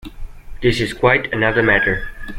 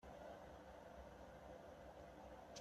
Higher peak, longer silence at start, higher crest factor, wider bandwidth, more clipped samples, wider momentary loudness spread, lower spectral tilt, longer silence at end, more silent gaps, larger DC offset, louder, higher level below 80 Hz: first, -2 dBFS vs -42 dBFS; about the same, 0.05 s vs 0 s; about the same, 16 dB vs 16 dB; first, 16 kHz vs 13.5 kHz; neither; first, 6 LU vs 2 LU; first, -6 dB/octave vs -4.5 dB/octave; about the same, 0 s vs 0 s; neither; neither; first, -16 LUFS vs -59 LUFS; first, -32 dBFS vs -68 dBFS